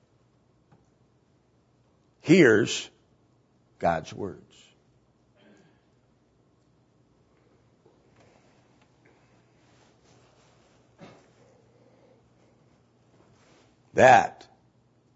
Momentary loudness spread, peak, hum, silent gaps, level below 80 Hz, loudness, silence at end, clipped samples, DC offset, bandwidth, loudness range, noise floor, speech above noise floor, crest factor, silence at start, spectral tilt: 21 LU; -4 dBFS; none; none; -66 dBFS; -22 LUFS; 0.85 s; under 0.1%; under 0.1%; 7.6 kHz; 10 LU; -65 dBFS; 44 dB; 26 dB; 2.25 s; -4 dB/octave